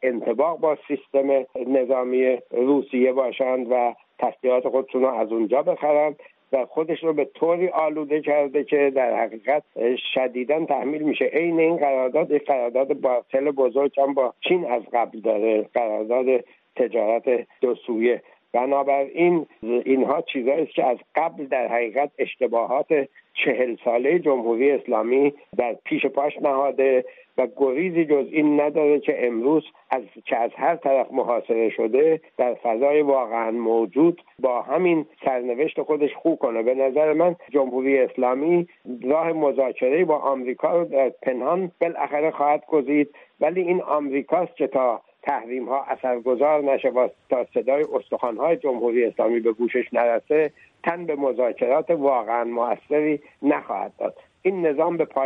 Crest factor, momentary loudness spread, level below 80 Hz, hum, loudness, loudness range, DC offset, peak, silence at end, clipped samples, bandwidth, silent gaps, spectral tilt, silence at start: 14 dB; 6 LU; -76 dBFS; none; -22 LUFS; 2 LU; under 0.1%; -8 dBFS; 0 s; under 0.1%; 3.9 kHz; none; -9 dB/octave; 0 s